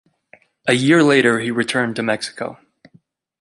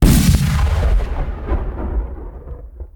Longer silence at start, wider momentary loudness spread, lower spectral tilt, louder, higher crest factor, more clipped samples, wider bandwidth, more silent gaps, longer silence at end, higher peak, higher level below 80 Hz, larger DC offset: first, 0.65 s vs 0 s; second, 14 LU vs 20 LU; about the same, -5 dB/octave vs -6 dB/octave; about the same, -17 LUFS vs -18 LUFS; about the same, 18 dB vs 16 dB; neither; second, 11.5 kHz vs 19.5 kHz; neither; first, 0.85 s vs 0.1 s; about the same, -2 dBFS vs 0 dBFS; second, -64 dBFS vs -18 dBFS; neither